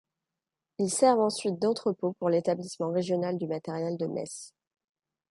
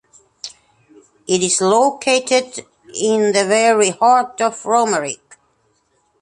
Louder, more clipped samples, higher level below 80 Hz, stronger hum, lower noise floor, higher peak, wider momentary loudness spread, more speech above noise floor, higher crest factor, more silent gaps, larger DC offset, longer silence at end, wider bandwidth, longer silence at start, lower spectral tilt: second, -29 LUFS vs -16 LUFS; neither; second, -76 dBFS vs -64 dBFS; neither; first, -89 dBFS vs -62 dBFS; second, -10 dBFS vs 0 dBFS; second, 13 LU vs 20 LU; first, 61 dB vs 47 dB; about the same, 20 dB vs 16 dB; neither; neither; second, 0.85 s vs 1.05 s; about the same, 11.5 kHz vs 11.5 kHz; first, 0.8 s vs 0.45 s; first, -5 dB/octave vs -2.5 dB/octave